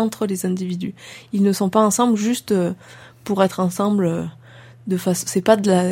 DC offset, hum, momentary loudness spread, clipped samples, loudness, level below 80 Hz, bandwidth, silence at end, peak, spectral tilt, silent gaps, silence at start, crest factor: under 0.1%; none; 14 LU; under 0.1%; -20 LUFS; -62 dBFS; 16.5 kHz; 0 s; 0 dBFS; -5.5 dB/octave; none; 0 s; 20 dB